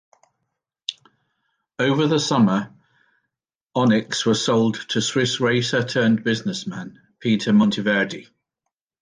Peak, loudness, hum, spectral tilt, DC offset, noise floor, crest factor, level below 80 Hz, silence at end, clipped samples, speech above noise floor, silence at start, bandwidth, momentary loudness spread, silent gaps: -6 dBFS; -20 LUFS; none; -5 dB/octave; under 0.1%; -82 dBFS; 16 dB; -62 dBFS; 0.8 s; under 0.1%; 62 dB; 0.9 s; 9.8 kHz; 14 LU; 3.55-3.67 s